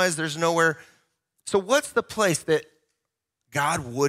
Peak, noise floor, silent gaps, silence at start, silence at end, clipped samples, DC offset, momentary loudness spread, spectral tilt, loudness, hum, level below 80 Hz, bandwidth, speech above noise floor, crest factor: -6 dBFS; -83 dBFS; none; 0 s; 0 s; under 0.1%; under 0.1%; 7 LU; -3.5 dB/octave; -24 LUFS; none; -62 dBFS; 16 kHz; 59 dB; 20 dB